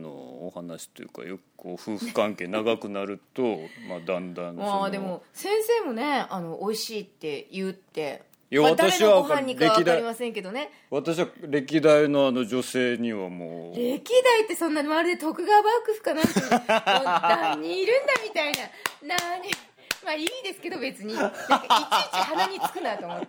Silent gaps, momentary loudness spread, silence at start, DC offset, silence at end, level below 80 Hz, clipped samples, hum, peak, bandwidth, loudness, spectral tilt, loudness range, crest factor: none; 16 LU; 0 s; under 0.1%; 0 s; -70 dBFS; under 0.1%; none; -8 dBFS; over 20 kHz; -25 LUFS; -4 dB/octave; 7 LU; 18 dB